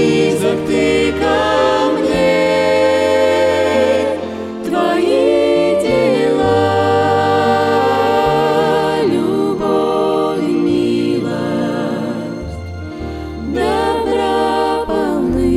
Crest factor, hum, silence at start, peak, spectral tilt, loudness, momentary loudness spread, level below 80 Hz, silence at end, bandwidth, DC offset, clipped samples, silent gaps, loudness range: 12 dB; none; 0 s; -2 dBFS; -5.5 dB/octave; -15 LUFS; 9 LU; -38 dBFS; 0 s; 15 kHz; under 0.1%; under 0.1%; none; 5 LU